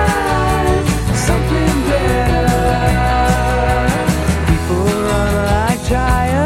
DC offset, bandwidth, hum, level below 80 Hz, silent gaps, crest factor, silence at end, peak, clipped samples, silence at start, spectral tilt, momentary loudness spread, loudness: under 0.1%; 16.5 kHz; none; -20 dBFS; none; 12 dB; 0 s; -2 dBFS; under 0.1%; 0 s; -5.5 dB/octave; 2 LU; -15 LUFS